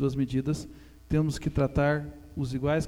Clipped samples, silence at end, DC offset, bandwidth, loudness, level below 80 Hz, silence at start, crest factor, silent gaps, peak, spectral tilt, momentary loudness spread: under 0.1%; 0 s; under 0.1%; 13 kHz; -29 LUFS; -42 dBFS; 0 s; 16 dB; none; -12 dBFS; -7 dB/octave; 9 LU